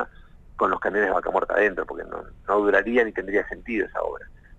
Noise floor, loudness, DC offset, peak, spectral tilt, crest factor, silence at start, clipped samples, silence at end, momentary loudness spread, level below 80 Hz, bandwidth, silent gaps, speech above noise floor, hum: -47 dBFS; -24 LUFS; under 0.1%; -8 dBFS; -6.5 dB/octave; 18 dB; 0 s; under 0.1%; 0.05 s; 14 LU; -48 dBFS; 7.8 kHz; none; 23 dB; none